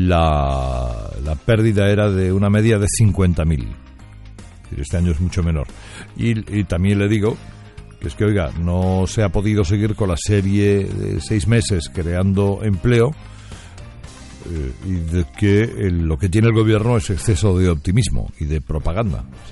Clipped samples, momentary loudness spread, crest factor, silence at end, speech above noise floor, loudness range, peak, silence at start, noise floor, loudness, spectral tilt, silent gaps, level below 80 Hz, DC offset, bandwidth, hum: under 0.1%; 16 LU; 14 dB; 0 s; 21 dB; 4 LU; -4 dBFS; 0 s; -38 dBFS; -18 LUFS; -6.5 dB/octave; none; -30 dBFS; under 0.1%; 11.5 kHz; none